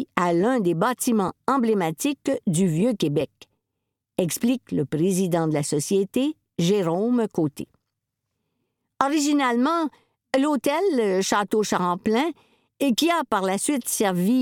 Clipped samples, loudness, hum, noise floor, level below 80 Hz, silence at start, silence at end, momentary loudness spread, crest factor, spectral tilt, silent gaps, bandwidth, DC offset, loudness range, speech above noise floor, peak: under 0.1%; -23 LUFS; none; -81 dBFS; -64 dBFS; 0 s; 0 s; 6 LU; 22 dB; -5 dB/octave; none; 18.5 kHz; under 0.1%; 3 LU; 59 dB; -2 dBFS